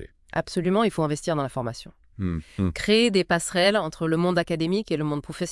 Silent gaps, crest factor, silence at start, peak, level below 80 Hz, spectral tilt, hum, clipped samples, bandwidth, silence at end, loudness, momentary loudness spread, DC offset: none; 18 dB; 0 s; -6 dBFS; -50 dBFS; -5 dB/octave; none; under 0.1%; 12 kHz; 0 s; -24 LUFS; 10 LU; under 0.1%